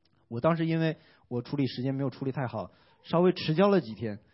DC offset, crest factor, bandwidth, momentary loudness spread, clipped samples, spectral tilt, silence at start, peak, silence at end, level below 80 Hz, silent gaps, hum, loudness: under 0.1%; 20 dB; 5.8 kHz; 13 LU; under 0.1%; -11 dB/octave; 0.3 s; -10 dBFS; 0.15 s; -66 dBFS; none; none; -29 LUFS